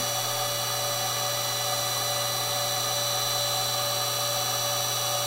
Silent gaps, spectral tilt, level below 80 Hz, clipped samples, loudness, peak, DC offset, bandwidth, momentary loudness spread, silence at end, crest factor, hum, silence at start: none; -1 dB/octave; -66 dBFS; under 0.1%; -25 LUFS; -14 dBFS; under 0.1%; 16 kHz; 2 LU; 0 s; 14 dB; none; 0 s